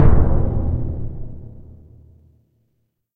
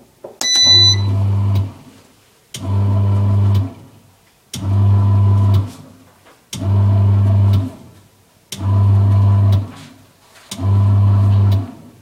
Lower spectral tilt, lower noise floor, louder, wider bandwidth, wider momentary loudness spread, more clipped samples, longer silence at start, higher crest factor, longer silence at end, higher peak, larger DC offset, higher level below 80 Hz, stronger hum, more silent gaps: first, -12 dB/octave vs -4.5 dB/octave; first, -69 dBFS vs -51 dBFS; second, -22 LUFS vs -14 LUFS; second, 2.5 kHz vs 11 kHz; first, 24 LU vs 17 LU; neither; second, 0 s vs 0.25 s; about the same, 18 dB vs 14 dB; first, 1.65 s vs 0.25 s; about the same, 0 dBFS vs -2 dBFS; neither; first, -22 dBFS vs -44 dBFS; neither; neither